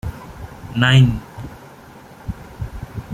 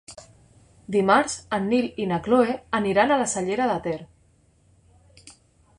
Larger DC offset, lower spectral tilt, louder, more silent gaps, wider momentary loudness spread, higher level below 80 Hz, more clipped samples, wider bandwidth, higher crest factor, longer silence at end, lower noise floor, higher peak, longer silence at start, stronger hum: neither; first, -6 dB/octave vs -4.5 dB/octave; first, -16 LUFS vs -23 LUFS; neither; first, 23 LU vs 8 LU; first, -38 dBFS vs -56 dBFS; neither; second, 9.6 kHz vs 11.5 kHz; about the same, 20 dB vs 20 dB; second, 0 s vs 0.5 s; second, -41 dBFS vs -60 dBFS; first, 0 dBFS vs -4 dBFS; about the same, 0.05 s vs 0.1 s; neither